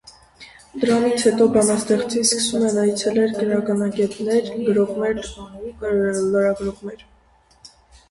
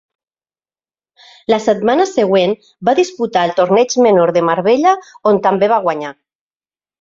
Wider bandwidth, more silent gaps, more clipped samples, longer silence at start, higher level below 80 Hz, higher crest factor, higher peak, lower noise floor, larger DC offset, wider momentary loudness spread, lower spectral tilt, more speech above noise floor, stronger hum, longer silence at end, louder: first, 11.5 kHz vs 7.8 kHz; neither; neither; second, 0.05 s vs 1.5 s; first, -50 dBFS vs -60 dBFS; about the same, 16 dB vs 14 dB; about the same, -4 dBFS vs -2 dBFS; second, -55 dBFS vs under -90 dBFS; neither; first, 13 LU vs 7 LU; about the same, -4 dB/octave vs -5 dB/octave; second, 36 dB vs over 77 dB; neither; second, 0.45 s vs 0.9 s; second, -20 LUFS vs -14 LUFS